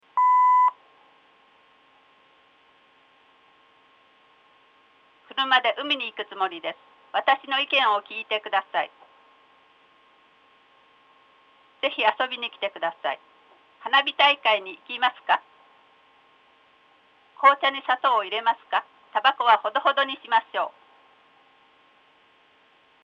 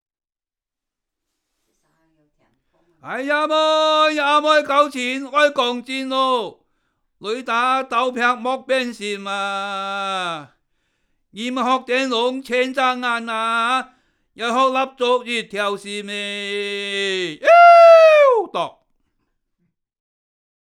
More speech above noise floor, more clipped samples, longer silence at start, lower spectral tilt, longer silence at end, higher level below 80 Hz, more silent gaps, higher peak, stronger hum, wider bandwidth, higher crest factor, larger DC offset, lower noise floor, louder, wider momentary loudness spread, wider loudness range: second, 36 dB vs over 70 dB; neither; second, 0.15 s vs 3.05 s; about the same, -2 dB/octave vs -3 dB/octave; first, 2.35 s vs 2.1 s; second, -84 dBFS vs -70 dBFS; neither; second, -4 dBFS vs 0 dBFS; neither; second, 7.4 kHz vs 12 kHz; first, 24 dB vs 18 dB; neither; second, -60 dBFS vs under -90 dBFS; second, -23 LUFS vs -17 LUFS; second, 12 LU vs 15 LU; about the same, 8 LU vs 10 LU